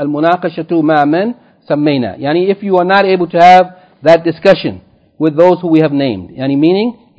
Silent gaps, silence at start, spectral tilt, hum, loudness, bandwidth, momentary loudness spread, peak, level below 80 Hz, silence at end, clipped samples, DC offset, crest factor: none; 0 s; -7.5 dB/octave; none; -11 LUFS; 8 kHz; 9 LU; 0 dBFS; -52 dBFS; 0.25 s; 2%; under 0.1%; 10 dB